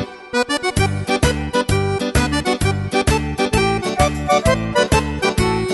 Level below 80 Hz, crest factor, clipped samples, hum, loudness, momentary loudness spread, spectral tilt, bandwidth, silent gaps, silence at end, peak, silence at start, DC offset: -28 dBFS; 16 dB; under 0.1%; none; -18 LUFS; 3 LU; -5 dB/octave; 12 kHz; none; 0 s; -2 dBFS; 0 s; under 0.1%